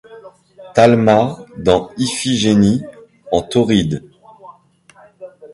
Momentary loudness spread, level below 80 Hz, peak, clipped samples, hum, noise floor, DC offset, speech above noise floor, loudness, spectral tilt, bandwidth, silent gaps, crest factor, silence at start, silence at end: 10 LU; -44 dBFS; 0 dBFS; under 0.1%; none; -49 dBFS; under 0.1%; 35 dB; -15 LUFS; -5.5 dB/octave; 11.5 kHz; none; 16 dB; 0.1 s; 0.05 s